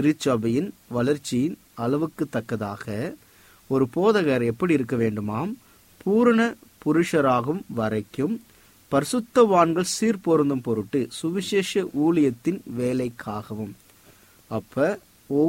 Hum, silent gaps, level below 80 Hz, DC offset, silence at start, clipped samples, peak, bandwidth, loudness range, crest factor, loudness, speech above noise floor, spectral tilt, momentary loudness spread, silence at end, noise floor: none; none; -60 dBFS; under 0.1%; 0 s; under 0.1%; -4 dBFS; 16.5 kHz; 4 LU; 20 dB; -24 LUFS; 31 dB; -6 dB/octave; 12 LU; 0 s; -54 dBFS